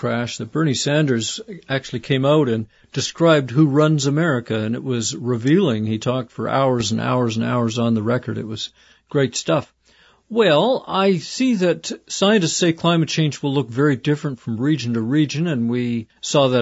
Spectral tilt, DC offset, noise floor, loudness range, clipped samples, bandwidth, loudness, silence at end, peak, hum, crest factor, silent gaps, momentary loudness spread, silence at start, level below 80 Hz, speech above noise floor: -5.5 dB/octave; under 0.1%; -55 dBFS; 3 LU; under 0.1%; 8 kHz; -19 LUFS; 0 s; -4 dBFS; none; 16 dB; none; 9 LU; 0 s; -58 dBFS; 36 dB